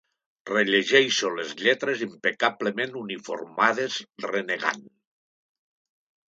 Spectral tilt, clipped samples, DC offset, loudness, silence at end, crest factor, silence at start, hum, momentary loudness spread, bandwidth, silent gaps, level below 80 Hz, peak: -2.5 dB/octave; under 0.1%; under 0.1%; -25 LUFS; 1.5 s; 22 dB; 0.45 s; none; 14 LU; 8 kHz; none; -78 dBFS; -4 dBFS